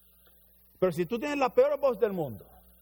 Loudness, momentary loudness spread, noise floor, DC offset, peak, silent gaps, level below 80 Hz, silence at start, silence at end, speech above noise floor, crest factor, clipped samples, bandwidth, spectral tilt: -28 LUFS; 11 LU; -60 dBFS; under 0.1%; -12 dBFS; none; -62 dBFS; 0.8 s; 0.4 s; 33 dB; 18 dB; under 0.1%; over 20 kHz; -6.5 dB/octave